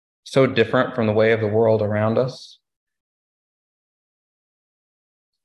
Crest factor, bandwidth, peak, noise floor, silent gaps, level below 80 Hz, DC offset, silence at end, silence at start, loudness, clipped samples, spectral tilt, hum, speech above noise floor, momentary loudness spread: 18 dB; 11 kHz; -4 dBFS; under -90 dBFS; none; -56 dBFS; under 0.1%; 3 s; 0.25 s; -19 LUFS; under 0.1%; -7 dB/octave; none; over 71 dB; 6 LU